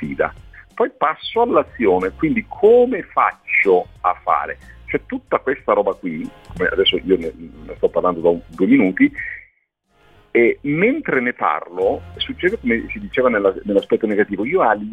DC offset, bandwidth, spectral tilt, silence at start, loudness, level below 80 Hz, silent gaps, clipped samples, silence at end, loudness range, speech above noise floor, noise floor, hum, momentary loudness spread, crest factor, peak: under 0.1%; 5 kHz; -7 dB/octave; 0 s; -18 LUFS; -46 dBFS; none; under 0.1%; 0 s; 4 LU; 45 dB; -63 dBFS; none; 11 LU; 16 dB; -2 dBFS